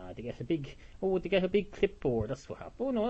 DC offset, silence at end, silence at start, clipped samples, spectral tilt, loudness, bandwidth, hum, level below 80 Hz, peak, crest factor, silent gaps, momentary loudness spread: under 0.1%; 0 s; 0 s; under 0.1%; -7 dB/octave; -33 LUFS; 8.2 kHz; none; -52 dBFS; -16 dBFS; 18 dB; none; 13 LU